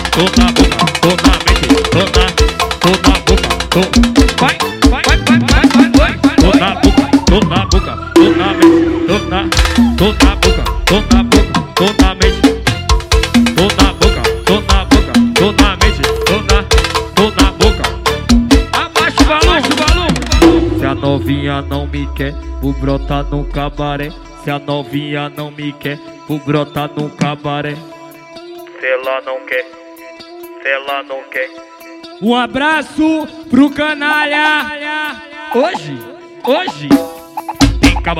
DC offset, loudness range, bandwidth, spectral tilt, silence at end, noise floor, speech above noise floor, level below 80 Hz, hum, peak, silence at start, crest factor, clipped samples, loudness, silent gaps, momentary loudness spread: under 0.1%; 10 LU; 16 kHz; -5 dB/octave; 0 s; -33 dBFS; 20 dB; -18 dBFS; none; 0 dBFS; 0 s; 12 dB; under 0.1%; -12 LUFS; none; 12 LU